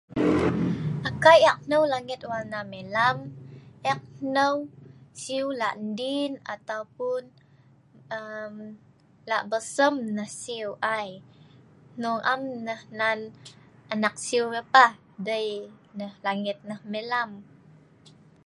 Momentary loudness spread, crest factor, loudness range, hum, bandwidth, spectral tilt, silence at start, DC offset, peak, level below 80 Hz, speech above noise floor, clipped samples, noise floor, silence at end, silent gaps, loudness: 17 LU; 24 dB; 9 LU; none; 11.5 kHz; -4.5 dB/octave; 0.1 s; under 0.1%; -4 dBFS; -58 dBFS; 31 dB; under 0.1%; -57 dBFS; 1 s; none; -26 LUFS